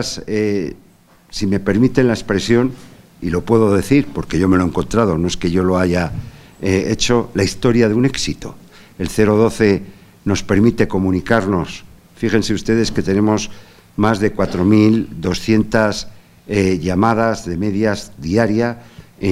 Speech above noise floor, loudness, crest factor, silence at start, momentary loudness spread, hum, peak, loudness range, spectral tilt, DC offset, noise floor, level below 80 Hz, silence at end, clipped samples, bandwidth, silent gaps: 29 dB; -16 LUFS; 16 dB; 0 s; 10 LU; none; 0 dBFS; 2 LU; -6 dB/octave; under 0.1%; -45 dBFS; -38 dBFS; 0 s; under 0.1%; 15 kHz; none